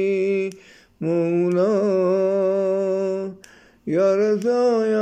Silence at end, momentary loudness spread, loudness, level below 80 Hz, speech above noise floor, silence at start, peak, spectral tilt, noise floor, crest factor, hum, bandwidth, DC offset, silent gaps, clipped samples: 0 s; 9 LU; -21 LUFS; -68 dBFS; 30 dB; 0 s; -10 dBFS; -7.5 dB/octave; -49 dBFS; 10 dB; none; 9 kHz; under 0.1%; none; under 0.1%